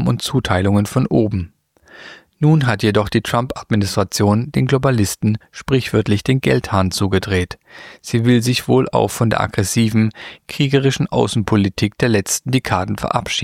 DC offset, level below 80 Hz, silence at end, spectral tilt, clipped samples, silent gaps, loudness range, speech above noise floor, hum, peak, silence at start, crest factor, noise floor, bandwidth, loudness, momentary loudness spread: under 0.1%; -42 dBFS; 0 s; -5.5 dB/octave; under 0.1%; none; 1 LU; 28 dB; none; -2 dBFS; 0 s; 16 dB; -44 dBFS; 16 kHz; -17 LUFS; 6 LU